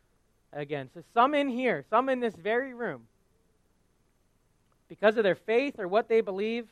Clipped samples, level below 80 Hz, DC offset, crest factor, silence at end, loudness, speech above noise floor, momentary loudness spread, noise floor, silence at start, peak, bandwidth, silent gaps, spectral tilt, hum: under 0.1%; -72 dBFS; under 0.1%; 22 dB; 0.1 s; -28 LUFS; 41 dB; 12 LU; -69 dBFS; 0.55 s; -8 dBFS; 10 kHz; none; -6 dB/octave; none